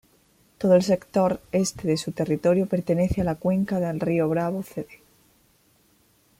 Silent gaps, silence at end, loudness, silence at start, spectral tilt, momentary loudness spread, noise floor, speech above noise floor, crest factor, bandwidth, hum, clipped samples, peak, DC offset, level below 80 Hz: none; 1.45 s; -24 LUFS; 0.6 s; -6.5 dB/octave; 8 LU; -62 dBFS; 39 dB; 18 dB; 16 kHz; none; under 0.1%; -6 dBFS; under 0.1%; -48 dBFS